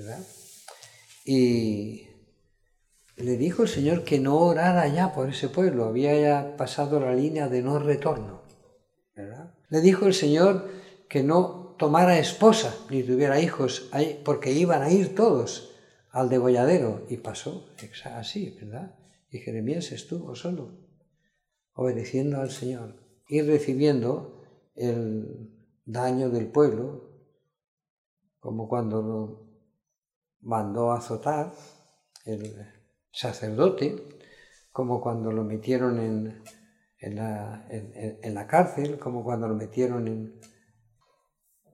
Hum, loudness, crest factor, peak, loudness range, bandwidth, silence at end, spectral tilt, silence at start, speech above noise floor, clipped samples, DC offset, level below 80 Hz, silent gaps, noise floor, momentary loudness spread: none; -25 LUFS; 24 dB; -2 dBFS; 10 LU; 13.5 kHz; 1.4 s; -6.5 dB/octave; 0 s; 52 dB; under 0.1%; under 0.1%; -66 dBFS; 27.68-27.77 s, 27.90-28.17 s, 30.16-30.22 s, 30.36-30.40 s; -77 dBFS; 20 LU